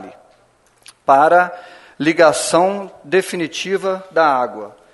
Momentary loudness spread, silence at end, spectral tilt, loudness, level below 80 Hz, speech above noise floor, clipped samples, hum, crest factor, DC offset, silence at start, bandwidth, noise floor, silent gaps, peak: 12 LU; 0.25 s; -4 dB/octave; -16 LUFS; -64 dBFS; 39 dB; under 0.1%; none; 18 dB; under 0.1%; 0 s; 12 kHz; -55 dBFS; none; 0 dBFS